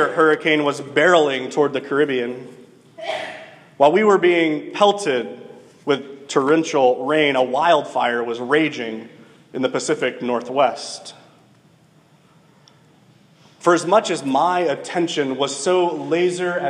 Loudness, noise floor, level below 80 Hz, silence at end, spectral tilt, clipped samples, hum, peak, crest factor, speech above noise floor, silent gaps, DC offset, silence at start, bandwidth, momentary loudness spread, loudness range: -19 LUFS; -53 dBFS; -76 dBFS; 0 s; -4 dB/octave; under 0.1%; none; 0 dBFS; 18 dB; 35 dB; none; under 0.1%; 0 s; 11 kHz; 14 LU; 6 LU